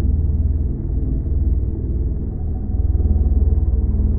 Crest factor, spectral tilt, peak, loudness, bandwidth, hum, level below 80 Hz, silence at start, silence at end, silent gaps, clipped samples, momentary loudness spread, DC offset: 12 dB; -16 dB/octave; -6 dBFS; -21 LUFS; 1.3 kHz; none; -18 dBFS; 0 s; 0 s; none; under 0.1%; 6 LU; under 0.1%